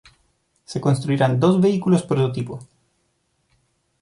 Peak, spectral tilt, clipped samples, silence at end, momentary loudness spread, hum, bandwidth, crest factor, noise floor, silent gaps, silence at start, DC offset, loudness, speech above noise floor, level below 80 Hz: -4 dBFS; -7.5 dB/octave; under 0.1%; 1.4 s; 15 LU; none; 11.5 kHz; 18 dB; -68 dBFS; none; 0.7 s; under 0.1%; -20 LUFS; 50 dB; -58 dBFS